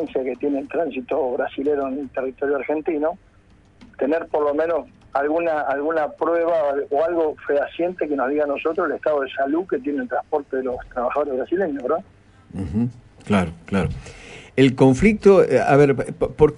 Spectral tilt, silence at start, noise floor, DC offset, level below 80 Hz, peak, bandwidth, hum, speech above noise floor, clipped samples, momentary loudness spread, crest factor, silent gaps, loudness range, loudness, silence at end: -7.5 dB/octave; 0 s; -52 dBFS; under 0.1%; -44 dBFS; -2 dBFS; 11 kHz; none; 32 dB; under 0.1%; 11 LU; 18 dB; none; 7 LU; -21 LUFS; 0 s